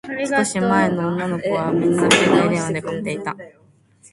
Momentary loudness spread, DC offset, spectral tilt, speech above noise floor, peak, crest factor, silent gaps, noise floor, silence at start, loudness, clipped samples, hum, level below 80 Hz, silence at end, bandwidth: 12 LU; under 0.1%; -4.5 dB/octave; 33 dB; 0 dBFS; 20 dB; none; -52 dBFS; 0.05 s; -19 LUFS; under 0.1%; none; -56 dBFS; 0.65 s; 11.5 kHz